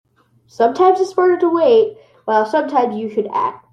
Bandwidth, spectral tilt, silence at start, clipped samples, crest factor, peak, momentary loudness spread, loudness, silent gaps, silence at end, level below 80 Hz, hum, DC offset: 9.2 kHz; -5.5 dB/octave; 0.6 s; under 0.1%; 14 dB; -2 dBFS; 8 LU; -16 LUFS; none; 0.15 s; -68 dBFS; none; under 0.1%